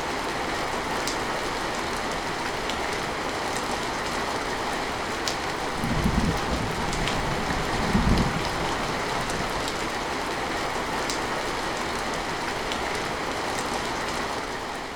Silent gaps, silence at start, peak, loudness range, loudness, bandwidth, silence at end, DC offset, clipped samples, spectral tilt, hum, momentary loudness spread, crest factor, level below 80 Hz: none; 0 s; -4 dBFS; 2 LU; -27 LUFS; 19.5 kHz; 0 s; under 0.1%; under 0.1%; -4 dB/octave; none; 4 LU; 24 dB; -38 dBFS